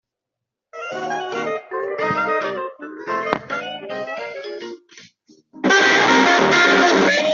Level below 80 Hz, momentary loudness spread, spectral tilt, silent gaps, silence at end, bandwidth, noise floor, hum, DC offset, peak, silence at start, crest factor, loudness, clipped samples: -62 dBFS; 18 LU; -3 dB/octave; none; 0 s; 7.6 kHz; -83 dBFS; none; under 0.1%; 0 dBFS; 0.75 s; 20 dB; -18 LUFS; under 0.1%